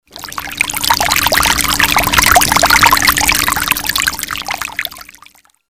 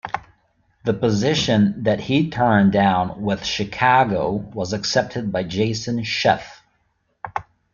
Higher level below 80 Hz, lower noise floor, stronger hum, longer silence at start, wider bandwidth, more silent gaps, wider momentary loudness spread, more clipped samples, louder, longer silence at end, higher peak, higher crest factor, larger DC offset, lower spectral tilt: first, -32 dBFS vs -50 dBFS; second, -45 dBFS vs -67 dBFS; neither; about the same, 0.15 s vs 0.05 s; first, over 20 kHz vs 7.2 kHz; neither; about the same, 13 LU vs 15 LU; neither; first, -11 LUFS vs -20 LUFS; first, 0.65 s vs 0.3 s; about the same, 0 dBFS vs -2 dBFS; about the same, 14 dB vs 18 dB; first, 1% vs under 0.1%; second, -1 dB/octave vs -5.5 dB/octave